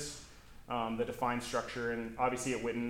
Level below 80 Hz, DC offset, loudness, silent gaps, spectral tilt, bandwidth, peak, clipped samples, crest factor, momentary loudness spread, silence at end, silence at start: -58 dBFS; under 0.1%; -36 LUFS; none; -4 dB/octave; 17.5 kHz; -18 dBFS; under 0.1%; 18 dB; 9 LU; 0 s; 0 s